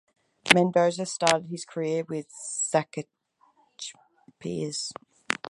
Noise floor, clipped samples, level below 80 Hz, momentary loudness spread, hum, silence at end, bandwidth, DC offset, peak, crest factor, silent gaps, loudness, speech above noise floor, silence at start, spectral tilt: -65 dBFS; under 0.1%; -70 dBFS; 19 LU; none; 0 s; 16 kHz; under 0.1%; 0 dBFS; 28 dB; none; -26 LUFS; 37 dB; 0.45 s; -3.5 dB/octave